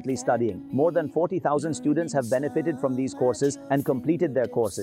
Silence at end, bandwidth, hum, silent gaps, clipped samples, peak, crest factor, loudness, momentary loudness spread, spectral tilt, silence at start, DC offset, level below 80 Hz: 0 s; 16 kHz; none; none; under 0.1%; -12 dBFS; 14 dB; -25 LUFS; 3 LU; -6.5 dB/octave; 0 s; under 0.1%; -66 dBFS